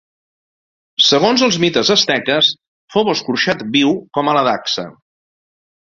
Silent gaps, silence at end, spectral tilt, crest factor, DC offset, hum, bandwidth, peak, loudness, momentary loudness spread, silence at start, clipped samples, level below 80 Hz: 2.68-2.88 s; 1.05 s; -3.5 dB/octave; 16 dB; under 0.1%; none; 7.6 kHz; 0 dBFS; -14 LUFS; 9 LU; 1 s; under 0.1%; -58 dBFS